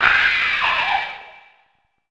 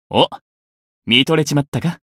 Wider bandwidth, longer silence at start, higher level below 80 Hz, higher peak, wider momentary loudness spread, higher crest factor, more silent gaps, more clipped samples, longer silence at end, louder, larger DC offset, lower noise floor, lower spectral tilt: second, 9.2 kHz vs 15.5 kHz; about the same, 0 s vs 0.1 s; about the same, -50 dBFS vs -54 dBFS; about the same, 0 dBFS vs 0 dBFS; first, 15 LU vs 9 LU; about the same, 20 dB vs 18 dB; second, none vs 0.41-1.02 s, 1.68-1.72 s; neither; first, 0.8 s vs 0.2 s; about the same, -17 LUFS vs -16 LUFS; neither; second, -64 dBFS vs under -90 dBFS; second, -1.5 dB/octave vs -4.5 dB/octave